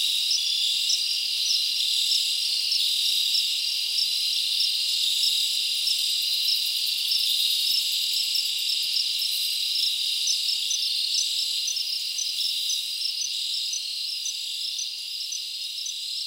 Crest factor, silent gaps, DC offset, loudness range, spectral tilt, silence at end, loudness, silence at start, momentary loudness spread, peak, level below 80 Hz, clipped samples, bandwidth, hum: 16 dB; none; under 0.1%; 4 LU; 5.5 dB/octave; 0 s; -22 LUFS; 0 s; 7 LU; -10 dBFS; -78 dBFS; under 0.1%; 17 kHz; none